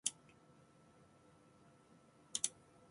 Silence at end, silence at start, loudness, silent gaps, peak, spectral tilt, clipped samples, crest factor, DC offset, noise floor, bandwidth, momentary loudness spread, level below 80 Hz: 0.4 s; 0.05 s; -42 LUFS; none; -18 dBFS; 0 dB/octave; under 0.1%; 34 dB; under 0.1%; -67 dBFS; 11.5 kHz; 27 LU; -84 dBFS